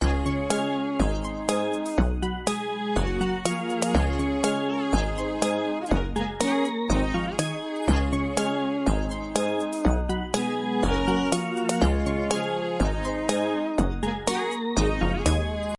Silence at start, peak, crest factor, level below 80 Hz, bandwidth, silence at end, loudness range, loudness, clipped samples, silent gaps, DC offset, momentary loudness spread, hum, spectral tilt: 0 s; -8 dBFS; 18 dB; -32 dBFS; 11.5 kHz; 0.05 s; 1 LU; -26 LUFS; under 0.1%; none; under 0.1%; 4 LU; none; -5 dB/octave